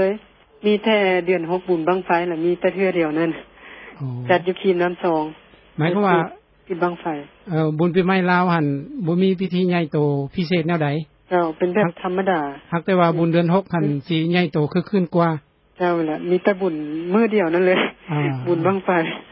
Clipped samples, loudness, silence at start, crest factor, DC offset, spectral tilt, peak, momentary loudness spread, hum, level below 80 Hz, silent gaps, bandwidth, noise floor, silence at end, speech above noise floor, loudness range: under 0.1%; -20 LUFS; 0 s; 16 dB; under 0.1%; -12 dB/octave; -4 dBFS; 8 LU; none; -60 dBFS; none; 5.8 kHz; -41 dBFS; 0.1 s; 22 dB; 2 LU